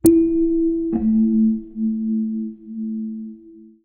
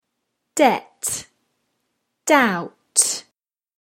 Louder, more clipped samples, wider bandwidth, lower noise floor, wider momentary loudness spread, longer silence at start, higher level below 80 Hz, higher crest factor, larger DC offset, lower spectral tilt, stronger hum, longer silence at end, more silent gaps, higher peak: about the same, -20 LUFS vs -20 LUFS; neither; second, 4.5 kHz vs 16.5 kHz; second, -44 dBFS vs -76 dBFS; about the same, 14 LU vs 13 LU; second, 0.05 s vs 0.55 s; first, -44 dBFS vs -68 dBFS; about the same, 18 dB vs 22 dB; neither; first, -10.5 dB/octave vs -2 dB/octave; neither; second, 0.2 s vs 0.6 s; neither; about the same, -2 dBFS vs 0 dBFS